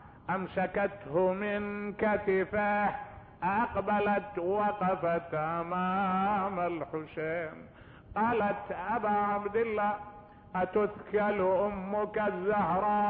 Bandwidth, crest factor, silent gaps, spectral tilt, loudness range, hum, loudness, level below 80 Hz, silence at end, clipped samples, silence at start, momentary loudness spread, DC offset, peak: 4.6 kHz; 14 dB; none; -5.5 dB/octave; 2 LU; none; -31 LUFS; -58 dBFS; 0 s; under 0.1%; 0 s; 8 LU; under 0.1%; -18 dBFS